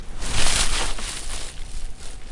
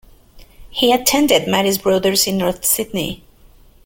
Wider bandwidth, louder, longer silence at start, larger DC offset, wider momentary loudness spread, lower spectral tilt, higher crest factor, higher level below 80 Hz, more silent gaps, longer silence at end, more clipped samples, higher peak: second, 11.5 kHz vs 17 kHz; second, -24 LUFS vs -16 LUFS; second, 0 s vs 0.35 s; neither; first, 18 LU vs 11 LU; second, -1.5 dB/octave vs -3 dB/octave; about the same, 16 dB vs 18 dB; first, -28 dBFS vs -44 dBFS; neither; second, 0 s vs 0.7 s; neither; second, -4 dBFS vs 0 dBFS